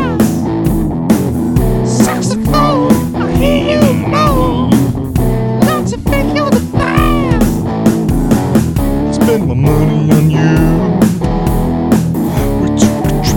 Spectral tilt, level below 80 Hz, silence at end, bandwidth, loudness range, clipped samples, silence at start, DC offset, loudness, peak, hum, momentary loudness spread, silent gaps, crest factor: -6.5 dB/octave; -22 dBFS; 0 s; 19 kHz; 1 LU; 0.4%; 0 s; under 0.1%; -12 LUFS; 0 dBFS; none; 4 LU; none; 10 dB